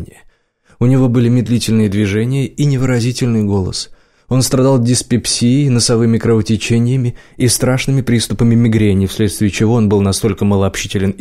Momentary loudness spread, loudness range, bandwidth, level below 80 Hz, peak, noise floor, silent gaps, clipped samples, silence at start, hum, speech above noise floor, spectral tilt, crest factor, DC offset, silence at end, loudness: 6 LU; 2 LU; 15.5 kHz; -38 dBFS; -2 dBFS; -52 dBFS; none; under 0.1%; 0 s; none; 40 dB; -5.5 dB/octave; 10 dB; 0.8%; 0.05 s; -13 LUFS